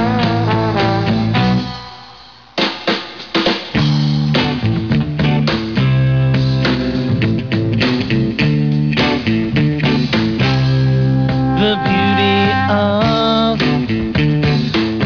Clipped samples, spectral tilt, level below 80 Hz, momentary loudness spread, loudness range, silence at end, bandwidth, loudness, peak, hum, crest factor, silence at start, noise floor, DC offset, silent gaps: under 0.1%; -7.5 dB/octave; -36 dBFS; 4 LU; 3 LU; 0 s; 5.4 kHz; -15 LUFS; -6 dBFS; none; 8 dB; 0 s; -39 dBFS; 0.4%; none